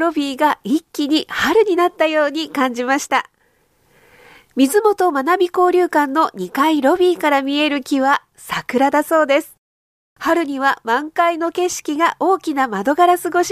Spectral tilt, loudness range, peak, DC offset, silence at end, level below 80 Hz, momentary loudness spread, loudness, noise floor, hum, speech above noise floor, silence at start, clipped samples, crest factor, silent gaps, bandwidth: -3 dB/octave; 3 LU; -2 dBFS; under 0.1%; 0 s; -60 dBFS; 6 LU; -17 LUFS; -60 dBFS; none; 43 dB; 0 s; under 0.1%; 14 dB; 9.58-10.16 s; 15.5 kHz